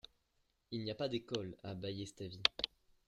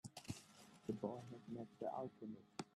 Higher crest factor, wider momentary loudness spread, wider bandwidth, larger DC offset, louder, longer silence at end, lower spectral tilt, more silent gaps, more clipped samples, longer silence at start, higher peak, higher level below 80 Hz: first, 34 dB vs 20 dB; first, 13 LU vs 8 LU; about the same, 13.5 kHz vs 13.5 kHz; neither; first, -40 LUFS vs -51 LUFS; first, 0.4 s vs 0.05 s; second, -4.5 dB/octave vs -6 dB/octave; neither; neither; about the same, 0.05 s vs 0.05 s; first, -8 dBFS vs -30 dBFS; first, -70 dBFS vs -82 dBFS